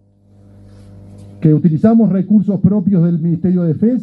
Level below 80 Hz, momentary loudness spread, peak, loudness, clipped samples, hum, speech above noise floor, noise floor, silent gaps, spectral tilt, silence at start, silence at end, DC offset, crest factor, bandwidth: -52 dBFS; 4 LU; 0 dBFS; -13 LUFS; under 0.1%; none; 34 dB; -46 dBFS; none; -12.5 dB/octave; 0.95 s; 0 s; under 0.1%; 14 dB; 3.9 kHz